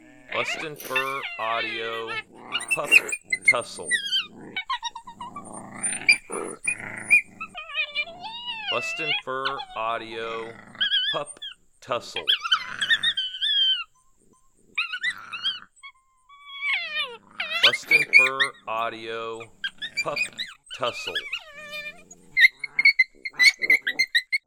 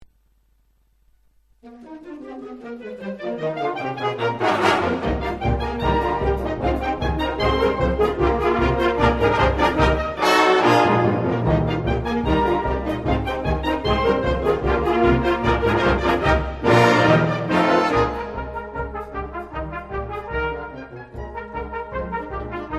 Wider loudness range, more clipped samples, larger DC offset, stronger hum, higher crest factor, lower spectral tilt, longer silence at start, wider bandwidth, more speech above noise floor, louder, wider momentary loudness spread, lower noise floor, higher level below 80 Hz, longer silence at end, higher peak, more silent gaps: second, 7 LU vs 12 LU; neither; neither; neither; first, 24 dB vs 18 dB; second, 0 dB/octave vs -6.5 dB/octave; second, 0.3 s vs 1.65 s; first, 19 kHz vs 13.5 kHz; about the same, 34 dB vs 37 dB; second, -23 LUFS vs -20 LUFS; about the same, 17 LU vs 15 LU; about the same, -59 dBFS vs -61 dBFS; second, -64 dBFS vs -32 dBFS; about the same, 0.1 s vs 0 s; about the same, -2 dBFS vs -2 dBFS; neither